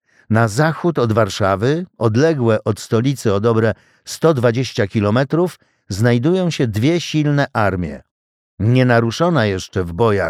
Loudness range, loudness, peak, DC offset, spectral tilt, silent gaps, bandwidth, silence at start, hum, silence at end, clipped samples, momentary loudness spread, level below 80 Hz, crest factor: 1 LU; -17 LUFS; -2 dBFS; under 0.1%; -6.5 dB/octave; 8.11-8.58 s; 14.5 kHz; 0.3 s; none; 0 s; under 0.1%; 6 LU; -48 dBFS; 14 dB